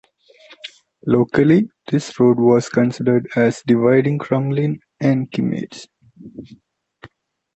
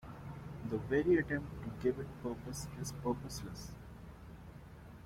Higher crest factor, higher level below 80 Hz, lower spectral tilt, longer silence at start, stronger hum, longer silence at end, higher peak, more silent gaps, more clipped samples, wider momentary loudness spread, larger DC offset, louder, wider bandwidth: about the same, 16 dB vs 18 dB; about the same, -56 dBFS vs -56 dBFS; first, -7.5 dB/octave vs -6 dB/octave; first, 0.65 s vs 0 s; neither; first, 1.1 s vs 0 s; first, -2 dBFS vs -20 dBFS; neither; neither; about the same, 22 LU vs 21 LU; neither; first, -17 LUFS vs -38 LUFS; second, 8.2 kHz vs 16 kHz